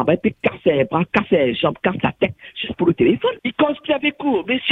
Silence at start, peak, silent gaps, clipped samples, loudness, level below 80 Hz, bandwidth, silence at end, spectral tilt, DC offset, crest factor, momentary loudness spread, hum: 0 s; 0 dBFS; none; under 0.1%; -19 LUFS; -52 dBFS; 5.4 kHz; 0 s; -8 dB/octave; under 0.1%; 18 dB; 5 LU; none